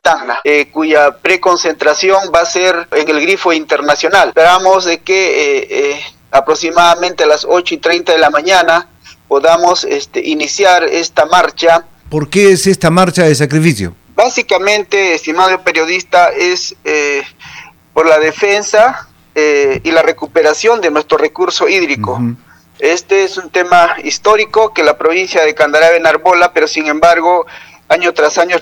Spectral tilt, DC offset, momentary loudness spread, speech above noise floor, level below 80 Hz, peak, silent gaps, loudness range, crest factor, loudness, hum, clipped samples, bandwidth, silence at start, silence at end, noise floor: -3.5 dB/octave; under 0.1%; 7 LU; 24 dB; -48 dBFS; 0 dBFS; none; 2 LU; 10 dB; -10 LUFS; none; 0.5%; 19 kHz; 0.05 s; 0 s; -34 dBFS